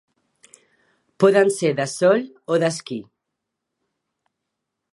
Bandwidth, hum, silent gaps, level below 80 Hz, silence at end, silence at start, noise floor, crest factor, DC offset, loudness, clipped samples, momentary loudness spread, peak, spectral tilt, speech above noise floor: 11.5 kHz; none; none; -76 dBFS; 1.9 s; 1.2 s; -81 dBFS; 20 dB; under 0.1%; -19 LUFS; under 0.1%; 14 LU; -2 dBFS; -5 dB/octave; 62 dB